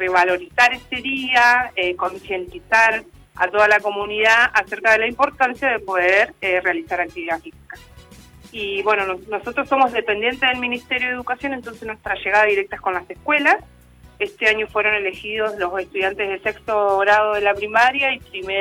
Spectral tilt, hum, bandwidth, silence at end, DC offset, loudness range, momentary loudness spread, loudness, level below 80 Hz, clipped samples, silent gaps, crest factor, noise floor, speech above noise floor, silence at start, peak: -3 dB/octave; none; 18.5 kHz; 0 s; under 0.1%; 5 LU; 11 LU; -18 LUFS; -52 dBFS; under 0.1%; none; 16 dB; -44 dBFS; 25 dB; 0 s; -4 dBFS